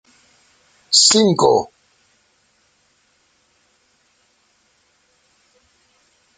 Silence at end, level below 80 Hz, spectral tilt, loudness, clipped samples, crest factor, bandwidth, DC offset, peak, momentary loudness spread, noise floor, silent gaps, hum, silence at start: 4.75 s; -62 dBFS; -2.5 dB/octave; -13 LUFS; under 0.1%; 22 dB; 9.6 kHz; under 0.1%; 0 dBFS; 9 LU; -61 dBFS; none; none; 0.9 s